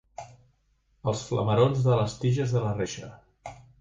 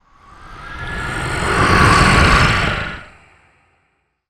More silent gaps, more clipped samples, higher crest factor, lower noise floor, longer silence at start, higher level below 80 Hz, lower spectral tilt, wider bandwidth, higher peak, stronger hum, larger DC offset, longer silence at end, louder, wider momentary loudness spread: neither; neither; about the same, 20 dB vs 16 dB; about the same, -68 dBFS vs -65 dBFS; second, 0.2 s vs 0.4 s; second, -54 dBFS vs -26 dBFS; first, -6.5 dB/octave vs -4.5 dB/octave; second, 7.8 kHz vs 17.5 kHz; second, -8 dBFS vs 0 dBFS; neither; neither; second, 0.2 s vs 1.25 s; second, -26 LUFS vs -14 LUFS; about the same, 22 LU vs 20 LU